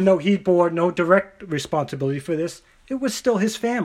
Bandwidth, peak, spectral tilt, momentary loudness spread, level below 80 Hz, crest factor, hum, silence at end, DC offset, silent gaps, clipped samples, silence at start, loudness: 15.5 kHz; -4 dBFS; -6 dB/octave; 10 LU; -58 dBFS; 18 dB; none; 0 s; under 0.1%; none; under 0.1%; 0 s; -22 LUFS